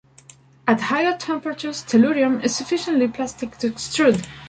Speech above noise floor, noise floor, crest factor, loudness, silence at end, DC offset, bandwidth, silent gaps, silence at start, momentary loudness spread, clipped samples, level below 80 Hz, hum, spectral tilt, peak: 29 dB; -50 dBFS; 16 dB; -21 LUFS; 0 s; under 0.1%; 9.4 kHz; none; 0.65 s; 9 LU; under 0.1%; -58 dBFS; none; -4.5 dB/octave; -4 dBFS